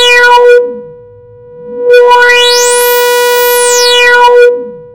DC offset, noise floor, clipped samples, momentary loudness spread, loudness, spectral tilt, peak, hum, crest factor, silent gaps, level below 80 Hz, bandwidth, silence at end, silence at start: under 0.1%; -33 dBFS; 7%; 12 LU; -4 LUFS; 1 dB/octave; 0 dBFS; none; 6 dB; none; -46 dBFS; 19.5 kHz; 0.05 s; 0 s